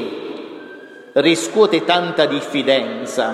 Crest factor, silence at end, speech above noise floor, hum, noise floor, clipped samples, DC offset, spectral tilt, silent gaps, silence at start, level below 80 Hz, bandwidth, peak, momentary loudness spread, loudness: 18 dB; 0 s; 21 dB; none; -38 dBFS; under 0.1%; under 0.1%; -3.5 dB/octave; none; 0 s; -70 dBFS; 14 kHz; -2 dBFS; 19 LU; -17 LUFS